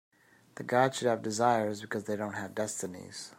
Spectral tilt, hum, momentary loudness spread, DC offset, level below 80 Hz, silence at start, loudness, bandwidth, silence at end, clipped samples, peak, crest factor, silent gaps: -4.5 dB/octave; none; 13 LU; under 0.1%; -76 dBFS; 0.55 s; -31 LUFS; 16 kHz; 0.05 s; under 0.1%; -12 dBFS; 20 dB; none